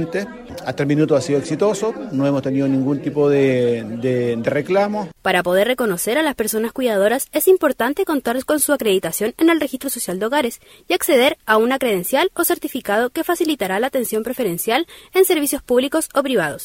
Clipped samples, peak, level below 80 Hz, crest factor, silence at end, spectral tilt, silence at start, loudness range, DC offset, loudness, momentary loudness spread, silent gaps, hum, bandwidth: under 0.1%; -2 dBFS; -54 dBFS; 16 dB; 0 s; -4.5 dB/octave; 0 s; 2 LU; under 0.1%; -18 LUFS; 7 LU; none; none; 16.5 kHz